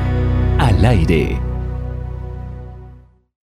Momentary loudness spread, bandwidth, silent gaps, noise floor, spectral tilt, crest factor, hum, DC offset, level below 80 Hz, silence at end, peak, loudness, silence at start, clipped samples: 19 LU; 11 kHz; none; -42 dBFS; -7.5 dB/octave; 14 dB; 60 Hz at -40 dBFS; under 0.1%; -22 dBFS; 0.45 s; -2 dBFS; -17 LUFS; 0 s; under 0.1%